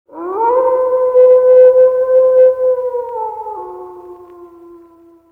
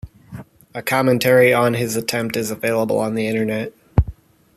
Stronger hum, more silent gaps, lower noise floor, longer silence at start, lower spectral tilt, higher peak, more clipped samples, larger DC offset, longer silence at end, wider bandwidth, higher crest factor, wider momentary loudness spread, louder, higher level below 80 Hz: neither; neither; first, -44 dBFS vs -38 dBFS; about the same, 0.15 s vs 0.05 s; first, -7 dB/octave vs -5.5 dB/octave; about the same, 0 dBFS vs -2 dBFS; neither; neither; first, 0.85 s vs 0.45 s; second, 2.7 kHz vs 14.5 kHz; second, 12 dB vs 18 dB; about the same, 20 LU vs 21 LU; first, -11 LUFS vs -19 LUFS; second, -58 dBFS vs -34 dBFS